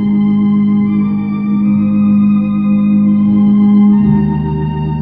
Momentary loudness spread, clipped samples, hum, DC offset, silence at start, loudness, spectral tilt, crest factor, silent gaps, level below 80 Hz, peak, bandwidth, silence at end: 7 LU; under 0.1%; none; under 0.1%; 0 s; -11 LUFS; -12 dB/octave; 10 dB; none; -36 dBFS; 0 dBFS; 3.8 kHz; 0 s